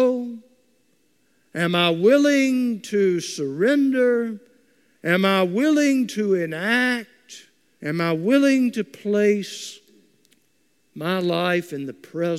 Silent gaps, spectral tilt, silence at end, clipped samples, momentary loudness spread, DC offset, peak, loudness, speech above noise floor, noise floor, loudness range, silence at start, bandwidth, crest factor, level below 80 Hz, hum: none; -5 dB/octave; 0 s; under 0.1%; 15 LU; under 0.1%; -6 dBFS; -21 LUFS; 46 dB; -67 dBFS; 4 LU; 0 s; 15 kHz; 16 dB; -76 dBFS; none